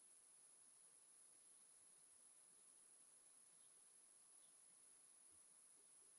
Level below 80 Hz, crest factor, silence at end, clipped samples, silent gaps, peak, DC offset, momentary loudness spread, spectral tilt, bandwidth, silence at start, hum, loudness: under -90 dBFS; 14 dB; 0 s; under 0.1%; none; -56 dBFS; under 0.1%; 1 LU; 0.5 dB/octave; 11.5 kHz; 0 s; none; -67 LUFS